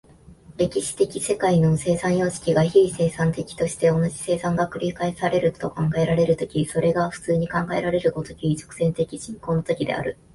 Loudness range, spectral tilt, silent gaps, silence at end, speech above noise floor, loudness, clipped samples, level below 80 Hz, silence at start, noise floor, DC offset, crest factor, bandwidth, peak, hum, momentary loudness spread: 3 LU; -6 dB/octave; none; 0.2 s; 26 dB; -23 LUFS; under 0.1%; -50 dBFS; 0.3 s; -48 dBFS; under 0.1%; 18 dB; 11.5 kHz; -4 dBFS; none; 7 LU